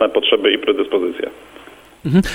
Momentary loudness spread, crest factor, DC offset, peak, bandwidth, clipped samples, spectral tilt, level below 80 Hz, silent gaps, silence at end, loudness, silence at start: 14 LU; 18 dB; under 0.1%; 0 dBFS; 16 kHz; under 0.1%; -6 dB/octave; -42 dBFS; none; 0 s; -17 LUFS; 0 s